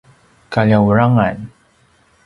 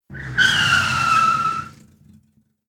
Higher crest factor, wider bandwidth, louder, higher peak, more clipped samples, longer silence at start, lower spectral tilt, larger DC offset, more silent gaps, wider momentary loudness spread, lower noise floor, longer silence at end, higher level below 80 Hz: about the same, 16 dB vs 16 dB; second, 6.6 kHz vs 16.5 kHz; first, -14 LUFS vs -17 LUFS; first, 0 dBFS vs -4 dBFS; neither; first, 0.5 s vs 0.1 s; first, -9 dB/octave vs -2 dB/octave; neither; neither; first, 17 LU vs 10 LU; second, -54 dBFS vs -60 dBFS; second, 0.8 s vs 0.95 s; about the same, -44 dBFS vs -48 dBFS